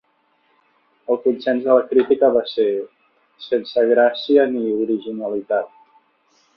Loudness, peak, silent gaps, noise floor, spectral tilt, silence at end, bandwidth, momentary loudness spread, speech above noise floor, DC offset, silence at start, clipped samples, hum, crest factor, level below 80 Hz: -19 LUFS; -2 dBFS; none; -63 dBFS; -7 dB/octave; 0.9 s; 5.8 kHz; 11 LU; 45 dB; under 0.1%; 1.1 s; under 0.1%; none; 18 dB; -66 dBFS